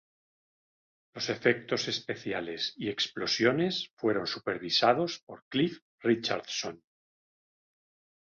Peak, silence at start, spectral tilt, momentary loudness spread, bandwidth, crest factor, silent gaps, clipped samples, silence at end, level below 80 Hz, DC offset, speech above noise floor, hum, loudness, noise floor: -10 dBFS; 1.15 s; -4 dB/octave; 9 LU; 7.4 kHz; 22 dB; 3.93-3.97 s, 5.23-5.27 s, 5.42-5.51 s, 5.82-5.98 s; under 0.1%; 1.5 s; -72 dBFS; under 0.1%; over 60 dB; none; -30 LUFS; under -90 dBFS